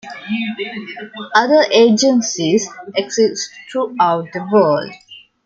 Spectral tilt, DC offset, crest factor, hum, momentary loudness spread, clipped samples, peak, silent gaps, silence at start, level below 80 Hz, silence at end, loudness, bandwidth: -4 dB/octave; under 0.1%; 16 dB; none; 14 LU; under 0.1%; -2 dBFS; none; 0.05 s; -66 dBFS; 0.25 s; -16 LUFS; 7.8 kHz